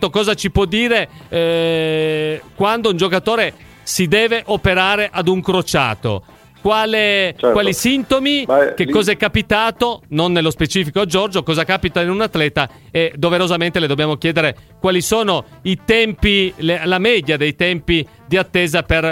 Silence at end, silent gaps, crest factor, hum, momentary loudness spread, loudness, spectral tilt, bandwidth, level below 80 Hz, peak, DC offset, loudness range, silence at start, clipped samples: 0 s; none; 16 dB; none; 5 LU; -16 LUFS; -4.5 dB/octave; 16.5 kHz; -36 dBFS; 0 dBFS; under 0.1%; 2 LU; 0 s; under 0.1%